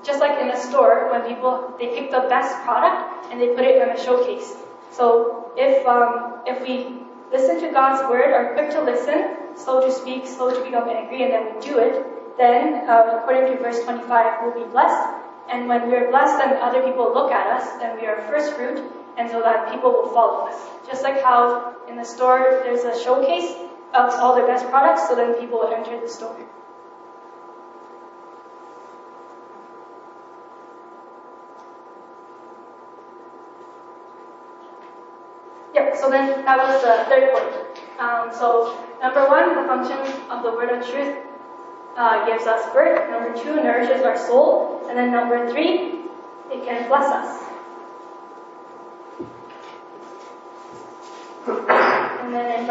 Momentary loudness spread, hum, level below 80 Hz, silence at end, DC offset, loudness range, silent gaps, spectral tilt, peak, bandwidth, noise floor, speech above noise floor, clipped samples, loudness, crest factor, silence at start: 21 LU; none; -84 dBFS; 0 s; under 0.1%; 8 LU; none; -1 dB/octave; -2 dBFS; 8 kHz; -42 dBFS; 23 dB; under 0.1%; -19 LUFS; 18 dB; 0 s